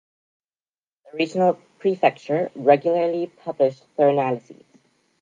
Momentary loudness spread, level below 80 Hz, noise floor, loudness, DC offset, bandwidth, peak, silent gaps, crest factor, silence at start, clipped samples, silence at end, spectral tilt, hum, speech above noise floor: 9 LU; -78 dBFS; under -90 dBFS; -22 LUFS; under 0.1%; 7.6 kHz; -2 dBFS; none; 22 dB; 1.15 s; under 0.1%; 0.7 s; -7 dB/octave; none; over 69 dB